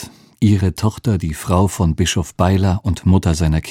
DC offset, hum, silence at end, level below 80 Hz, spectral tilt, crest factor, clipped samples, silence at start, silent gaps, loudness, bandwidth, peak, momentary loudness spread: under 0.1%; none; 0 s; -30 dBFS; -6 dB/octave; 16 dB; under 0.1%; 0 s; none; -17 LUFS; 15.5 kHz; 0 dBFS; 5 LU